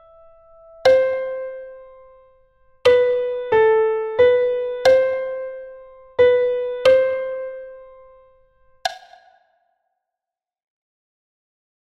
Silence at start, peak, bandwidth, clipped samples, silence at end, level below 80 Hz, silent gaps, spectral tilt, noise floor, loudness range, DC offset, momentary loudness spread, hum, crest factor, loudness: 0.85 s; -2 dBFS; 8.6 kHz; under 0.1%; 2.85 s; -56 dBFS; none; -3.5 dB/octave; -88 dBFS; 19 LU; under 0.1%; 17 LU; none; 18 dB; -18 LUFS